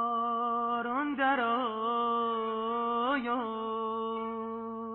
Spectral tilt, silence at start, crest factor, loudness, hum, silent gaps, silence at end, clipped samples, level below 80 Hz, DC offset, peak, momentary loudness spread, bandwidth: -1.5 dB/octave; 0 s; 16 dB; -31 LUFS; none; none; 0 s; under 0.1%; -72 dBFS; under 0.1%; -16 dBFS; 7 LU; 4 kHz